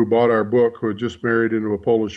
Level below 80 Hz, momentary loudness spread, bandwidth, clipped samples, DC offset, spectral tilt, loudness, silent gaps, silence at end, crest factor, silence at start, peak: -58 dBFS; 8 LU; 7.6 kHz; under 0.1%; under 0.1%; -7.5 dB/octave; -19 LUFS; none; 0 s; 12 dB; 0 s; -6 dBFS